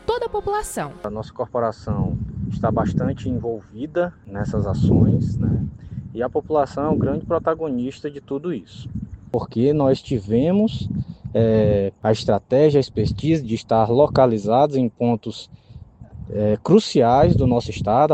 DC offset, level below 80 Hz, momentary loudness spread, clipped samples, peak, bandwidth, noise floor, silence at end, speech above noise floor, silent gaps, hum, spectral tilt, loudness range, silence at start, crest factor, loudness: under 0.1%; -40 dBFS; 13 LU; under 0.1%; -2 dBFS; 13.5 kHz; -42 dBFS; 0 s; 22 dB; none; none; -7.5 dB/octave; 6 LU; 0.1 s; 18 dB; -20 LUFS